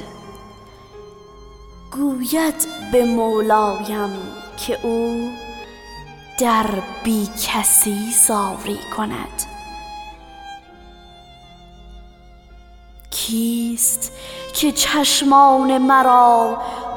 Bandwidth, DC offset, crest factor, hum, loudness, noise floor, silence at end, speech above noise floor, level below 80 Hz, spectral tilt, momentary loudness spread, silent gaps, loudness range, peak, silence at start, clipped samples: 19.5 kHz; under 0.1%; 18 dB; none; -17 LUFS; -44 dBFS; 0 s; 26 dB; -46 dBFS; -2.5 dB/octave; 22 LU; none; 15 LU; -2 dBFS; 0 s; under 0.1%